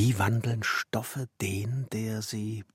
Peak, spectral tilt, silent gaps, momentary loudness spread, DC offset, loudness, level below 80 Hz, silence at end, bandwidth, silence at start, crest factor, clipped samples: -14 dBFS; -5 dB/octave; none; 7 LU; under 0.1%; -31 LUFS; -64 dBFS; 0.1 s; 16.5 kHz; 0 s; 16 dB; under 0.1%